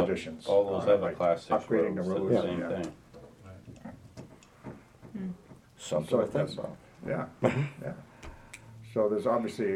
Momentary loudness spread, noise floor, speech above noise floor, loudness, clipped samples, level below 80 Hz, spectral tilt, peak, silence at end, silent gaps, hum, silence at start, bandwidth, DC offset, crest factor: 22 LU; -52 dBFS; 23 dB; -30 LUFS; under 0.1%; -60 dBFS; -7 dB/octave; -12 dBFS; 0 s; none; none; 0 s; 12.5 kHz; under 0.1%; 20 dB